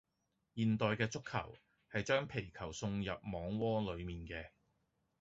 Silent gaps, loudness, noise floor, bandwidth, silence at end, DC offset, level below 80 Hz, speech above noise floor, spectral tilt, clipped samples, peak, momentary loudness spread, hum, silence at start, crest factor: none; -39 LUFS; -84 dBFS; 8 kHz; 0.7 s; under 0.1%; -60 dBFS; 45 dB; -5 dB/octave; under 0.1%; -20 dBFS; 12 LU; none; 0.55 s; 20 dB